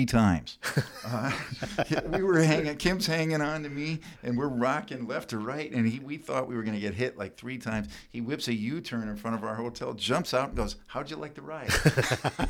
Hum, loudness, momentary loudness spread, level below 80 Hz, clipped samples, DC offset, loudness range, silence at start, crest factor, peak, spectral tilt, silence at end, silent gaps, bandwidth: none; -30 LUFS; 12 LU; -46 dBFS; under 0.1%; under 0.1%; 5 LU; 0 s; 22 dB; -8 dBFS; -5.5 dB/octave; 0 s; none; 17.5 kHz